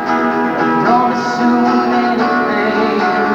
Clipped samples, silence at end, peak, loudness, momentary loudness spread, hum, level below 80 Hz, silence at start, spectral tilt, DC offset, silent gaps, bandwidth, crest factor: under 0.1%; 0 s; -2 dBFS; -14 LUFS; 3 LU; none; -50 dBFS; 0 s; -6 dB/octave; under 0.1%; none; 7.4 kHz; 12 dB